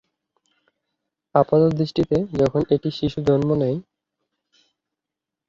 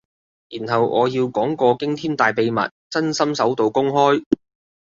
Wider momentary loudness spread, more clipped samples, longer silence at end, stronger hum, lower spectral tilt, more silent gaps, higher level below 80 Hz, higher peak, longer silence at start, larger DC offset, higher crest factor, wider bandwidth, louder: about the same, 6 LU vs 6 LU; neither; first, 1.7 s vs 0.5 s; neither; first, -8.5 dB/octave vs -5.5 dB/octave; second, none vs 2.71-2.90 s, 4.26-4.31 s; first, -50 dBFS vs -60 dBFS; about the same, -2 dBFS vs -2 dBFS; first, 1.35 s vs 0.5 s; neither; about the same, 20 dB vs 18 dB; about the same, 7.6 kHz vs 7.6 kHz; about the same, -21 LUFS vs -19 LUFS